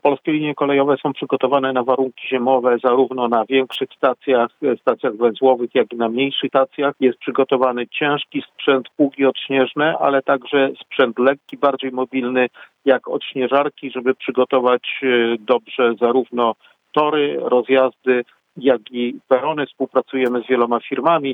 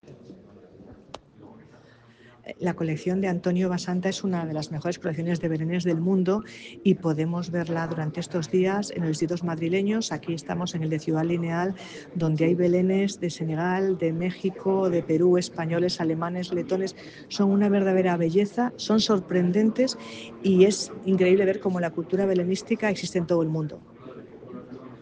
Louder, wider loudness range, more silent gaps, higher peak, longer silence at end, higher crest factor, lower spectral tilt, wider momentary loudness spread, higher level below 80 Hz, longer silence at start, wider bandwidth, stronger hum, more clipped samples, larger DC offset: first, -18 LUFS vs -25 LUFS; second, 1 LU vs 5 LU; neither; first, 0 dBFS vs -6 dBFS; about the same, 0 s vs 0 s; about the same, 18 dB vs 20 dB; about the same, -7.5 dB/octave vs -6.5 dB/octave; second, 5 LU vs 14 LU; second, -74 dBFS vs -64 dBFS; about the same, 0.05 s vs 0.05 s; second, 4 kHz vs 9.6 kHz; neither; neither; neither